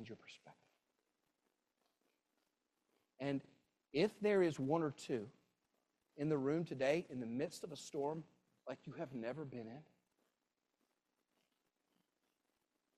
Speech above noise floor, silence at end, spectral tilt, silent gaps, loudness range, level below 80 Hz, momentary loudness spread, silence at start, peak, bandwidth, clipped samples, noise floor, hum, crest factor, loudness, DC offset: 48 dB; 3.15 s; -6.5 dB/octave; none; 13 LU; -82 dBFS; 19 LU; 0 s; -24 dBFS; 13.5 kHz; under 0.1%; -89 dBFS; none; 22 dB; -41 LUFS; under 0.1%